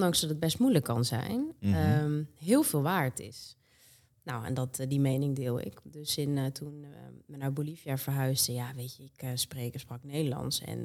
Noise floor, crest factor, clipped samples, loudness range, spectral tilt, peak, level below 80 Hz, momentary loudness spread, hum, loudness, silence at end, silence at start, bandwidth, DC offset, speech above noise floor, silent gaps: -62 dBFS; 20 dB; under 0.1%; 5 LU; -5 dB/octave; -12 dBFS; -64 dBFS; 16 LU; none; -31 LUFS; 0 s; 0 s; 17 kHz; under 0.1%; 31 dB; none